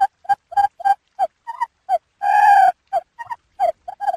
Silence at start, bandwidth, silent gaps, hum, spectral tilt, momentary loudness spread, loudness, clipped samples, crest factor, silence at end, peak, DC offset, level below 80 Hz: 0 s; 13.5 kHz; none; none; -1.5 dB/octave; 15 LU; -19 LUFS; under 0.1%; 16 dB; 0 s; -4 dBFS; under 0.1%; -64 dBFS